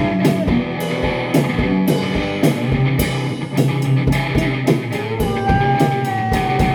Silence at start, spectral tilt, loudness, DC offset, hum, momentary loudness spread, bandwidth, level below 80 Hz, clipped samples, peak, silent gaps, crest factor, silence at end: 0 s; -6.5 dB/octave; -18 LUFS; under 0.1%; none; 4 LU; 18 kHz; -32 dBFS; under 0.1%; -2 dBFS; none; 14 dB; 0 s